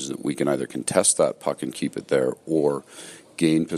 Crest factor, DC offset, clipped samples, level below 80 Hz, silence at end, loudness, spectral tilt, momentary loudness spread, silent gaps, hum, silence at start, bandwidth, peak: 20 dB; under 0.1%; under 0.1%; -64 dBFS; 0 s; -23 LUFS; -4 dB/octave; 12 LU; none; none; 0 s; 14.5 kHz; -4 dBFS